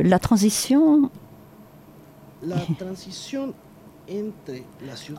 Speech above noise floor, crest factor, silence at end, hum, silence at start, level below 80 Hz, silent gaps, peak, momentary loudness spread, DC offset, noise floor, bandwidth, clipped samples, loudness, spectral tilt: 25 dB; 18 dB; 0 s; none; 0 s; -50 dBFS; none; -6 dBFS; 20 LU; under 0.1%; -47 dBFS; 16.5 kHz; under 0.1%; -22 LUFS; -5.5 dB/octave